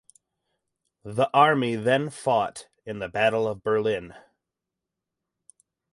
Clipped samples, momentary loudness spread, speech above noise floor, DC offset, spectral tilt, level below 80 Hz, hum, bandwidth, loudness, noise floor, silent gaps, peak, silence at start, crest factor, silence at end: under 0.1%; 14 LU; 62 dB; under 0.1%; -5.5 dB/octave; -64 dBFS; none; 11.5 kHz; -24 LUFS; -86 dBFS; none; -4 dBFS; 1.05 s; 22 dB; 1.75 s